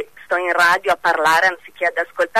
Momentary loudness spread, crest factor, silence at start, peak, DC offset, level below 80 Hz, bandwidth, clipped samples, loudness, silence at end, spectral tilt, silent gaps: 7 LU; 12 dB; 0 s; -6 dBFS; 0.3%; -58 dBFS; 13.5 kHz; under 0.1%; -17 LUFS; 0 s; -2 dB/octave; none